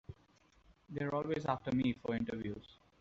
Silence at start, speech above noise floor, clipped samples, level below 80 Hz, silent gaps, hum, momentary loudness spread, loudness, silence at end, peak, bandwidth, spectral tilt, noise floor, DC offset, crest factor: 0.1 s; 32 dB; under 0.1%; -64 dBFS; none; none; 13 LU; -38 LUFS; 0.25 s; -20 dBFS; 7.6 kHz; -6 dB/octave; -69 dBFS; under 0.1%; 20 dB